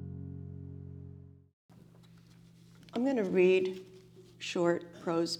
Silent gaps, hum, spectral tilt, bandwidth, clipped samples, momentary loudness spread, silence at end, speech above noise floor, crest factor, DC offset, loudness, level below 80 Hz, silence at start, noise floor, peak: 1.53-1.69 s; none; -6 dB/octave; 11 kHz; under 0.1%; 22 LU; 0 s; 28 dB; 18 dB; under 0.1%; -31 LUFS; -70 dBFS; 0 s; -58 dBFS; -16 dBFS